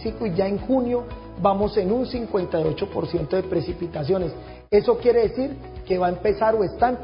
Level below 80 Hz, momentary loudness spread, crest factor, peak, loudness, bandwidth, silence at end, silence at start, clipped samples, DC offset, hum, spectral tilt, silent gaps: -42 dBFS; 9 LU; 16 dB; -6 dBFS; -23 LUFS; 5.4 kHz; 0 s; 0 s; under 0.1%; under 0.1%; none; -11.5 dB/octave; none